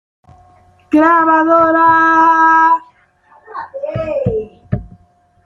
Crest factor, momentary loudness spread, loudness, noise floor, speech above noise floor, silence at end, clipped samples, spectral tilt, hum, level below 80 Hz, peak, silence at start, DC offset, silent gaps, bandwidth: 12 dB; 15 LU; -11 LUFS; -51 dBFS; 42 dB; 0.6 s; under 0.1%; -7.5 dB/octave; none; -44 dBFS; -2 dBFS; 0.9 s; under 0.1%; none; 6.6 kHz